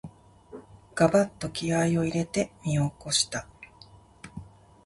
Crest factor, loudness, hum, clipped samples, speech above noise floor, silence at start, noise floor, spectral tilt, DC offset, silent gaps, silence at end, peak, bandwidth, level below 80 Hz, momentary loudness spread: 22 dB; -26 LUFS; none; under 0.1%; 27 dB; 0.05 s; -53 dBFS; -4.5 dB/octave; under 0.1%; none; 0.4 s; -6 dBFS; 11.5 kHz; -56 dBFS; 25 LU